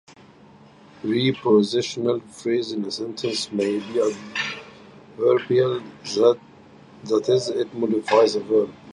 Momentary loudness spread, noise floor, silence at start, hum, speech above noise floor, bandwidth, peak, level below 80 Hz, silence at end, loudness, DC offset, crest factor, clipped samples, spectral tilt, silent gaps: 10 LU; -49 dBFS; 1.05 s; none; 28 dB; 11.5 kHz; -4 dBFS; -66 dBFS; 0.05 s; -22 LUFS; under 0.1%; 18 dB; under 0.1%; -5 dB/octave; none